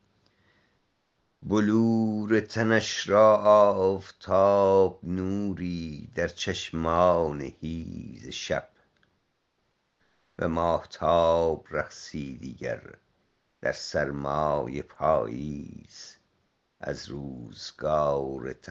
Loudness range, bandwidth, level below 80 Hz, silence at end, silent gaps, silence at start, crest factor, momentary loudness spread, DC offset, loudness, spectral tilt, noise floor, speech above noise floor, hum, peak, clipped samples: 11 LU; 7.8 kHz; -54 dBFS; 0 s; none; 1.4 s; 20 dB; 18 LU; under 0.1%; -26 LUFS; -6 dB/octave; -75 dBFS; 49 dB; none; -6 dBFS; under 0.1%